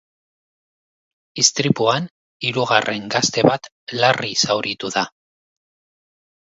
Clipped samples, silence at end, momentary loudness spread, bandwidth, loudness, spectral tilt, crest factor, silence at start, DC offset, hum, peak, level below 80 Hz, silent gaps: under 0.1%; 1.4 s; 11 LU; 8 kHz; -18 LUFS; -3 dB/octave; 22 dB; 1.35 s; under 0.1%; none; 0 dBFS; -62 dBFS; 2.11-2.40 s, 3.72-3.87 s